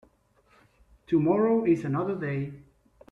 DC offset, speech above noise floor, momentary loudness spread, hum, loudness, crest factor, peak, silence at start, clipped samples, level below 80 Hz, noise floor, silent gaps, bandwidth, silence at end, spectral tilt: under 0.1%; 39 dB; 10 LU; none; -26 LUFS; 16 dB; -12 dBFS; 1.1 s; under 0.1%; -62 dBFS; -64 dBFS; none; 7 kHz; 0.5 s; -9.5 dB/octave